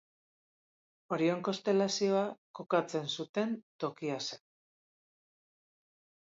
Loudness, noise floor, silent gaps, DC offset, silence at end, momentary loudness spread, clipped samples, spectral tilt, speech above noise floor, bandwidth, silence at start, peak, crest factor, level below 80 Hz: -34 LUFS; under -90 dBFS; 2.38-2.54 s, 3.29-3.34 s, 3.63-3.79 s; under 0.1%; 1.95 s; 10 LU; under 0.1%; -5 dB/octave; over 57 dB; 7.8 kHz; 1.1 s; -16 dBFS; 20 dB; -86 dBFS